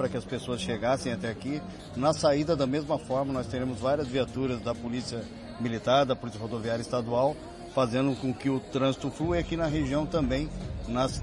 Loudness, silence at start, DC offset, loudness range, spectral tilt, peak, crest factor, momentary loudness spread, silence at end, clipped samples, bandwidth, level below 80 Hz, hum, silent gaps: -29 LUFS; 0 s; under 0.1%; 1 LU; -6 dB/octave; -10 dBFS; 18 dB; 9 LU; 0 s; under 0.1%; 11.5 kHz; -46 dBFS; none; none